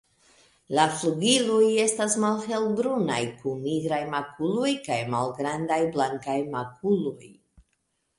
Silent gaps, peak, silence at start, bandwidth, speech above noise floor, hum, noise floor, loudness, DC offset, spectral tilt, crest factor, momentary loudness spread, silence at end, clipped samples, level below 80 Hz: none; -6 dBFS; 0.7 s; 11.5 kHz; 49 dB; none; -75 dBFS; -26 LUFS; under 0.1%; -4 dB/octave; 20 dB; 9 LU; 0.85 s; under 0.1%; -66 dBFS